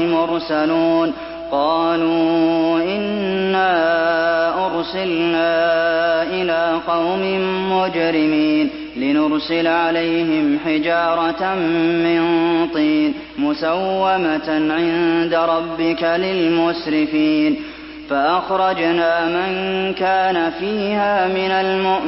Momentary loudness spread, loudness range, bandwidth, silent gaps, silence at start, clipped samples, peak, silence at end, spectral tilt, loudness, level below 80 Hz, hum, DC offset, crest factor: 4 LU; 1 LU; 5.8 kHz; none; 0 s; under 0.1%; -4 dBFS; 0 s; -9.5 dB/octave; -18 LUFS; -50 dBFS; none; under 0.1%; 12 dB